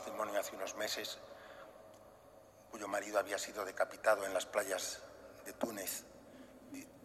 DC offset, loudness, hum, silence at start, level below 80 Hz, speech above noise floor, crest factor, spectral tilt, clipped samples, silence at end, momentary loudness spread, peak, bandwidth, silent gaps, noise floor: under 0.1%; -39 LUFS; none; 0 s; -76 dBFS; 21 dB; 22 dB; -1.5 dB/octave; under 0.1%; 0 s; 21 LU; -20 dBFS; 15.5 kHz; none; -61 dBFS